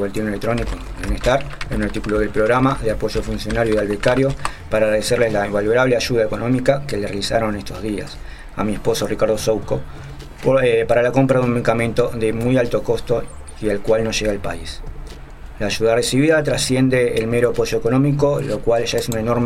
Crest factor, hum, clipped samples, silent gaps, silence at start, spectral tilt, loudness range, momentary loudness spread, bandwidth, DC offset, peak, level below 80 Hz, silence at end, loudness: 18 dB; none; under 0.1%; none; 0 s; -5.5 dB/octave; 4 LU; 11 LU; 16 kHz; under 0.1%; 0 dBFS; -32 dBFS; 0 s; -19 LUFS